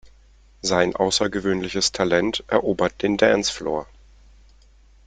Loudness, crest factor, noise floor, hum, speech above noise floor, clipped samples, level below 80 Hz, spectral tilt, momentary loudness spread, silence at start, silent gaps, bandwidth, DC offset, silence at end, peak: -21 LUFS; 20 dB; -52 dBFS; none; 31 dB; under 0.1%; -48 dBFS; -3.5 dB/octave; 8 LU; 0.05 s; none; 9.6 kHz; under 0.1%; 1.2 s; -2 dBFS